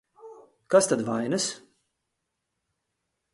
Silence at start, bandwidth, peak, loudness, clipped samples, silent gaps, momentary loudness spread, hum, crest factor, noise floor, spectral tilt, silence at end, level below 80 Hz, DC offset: 0.25 s; 11.5 kHz; -8 dBFS; -25 LUFS; under 0.1%; none; 9 LU; none; 22 dB; -81 dBFS; -3.5 dB/octave; 1.75 s; -72 dBFS; under 0.1%